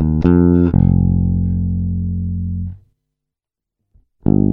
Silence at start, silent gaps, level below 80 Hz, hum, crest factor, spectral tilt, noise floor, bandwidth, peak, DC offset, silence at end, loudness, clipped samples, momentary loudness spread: 0 s; none; -28 dBFS; none; 16 dB; -13 dB/octave; -84 dBFS; 2.9 kHz; 0 dBFS; under 0.1%; 0 s; -16 LUFS; under 0.1%; 11 LU